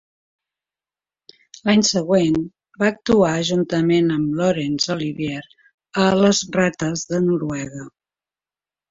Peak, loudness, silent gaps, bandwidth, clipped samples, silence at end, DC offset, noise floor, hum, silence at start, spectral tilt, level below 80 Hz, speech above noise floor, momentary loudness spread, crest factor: -4 dBFS; -19 LUFS; 5.74-5.78 s; 7.8 kHz; under 0.1%; 1 s; under 0.1%; under -90 dBFS; none; 1.65 s; -5 dB/octave; -54 dBFS; over 71 dB; 11 LU; 18 dB